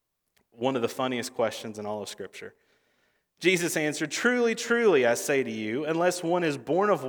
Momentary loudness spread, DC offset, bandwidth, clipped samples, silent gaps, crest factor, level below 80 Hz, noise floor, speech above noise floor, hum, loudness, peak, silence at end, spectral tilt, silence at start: 13 LU; under 0.1%; over 20 kHz; under 0.1%; none; 18 dB; -78 dBFS; -73 dBFS; 46 dB; none; -27 LUFS; -8 dBFS; 0 s; -4 dB/octave; 0.6 s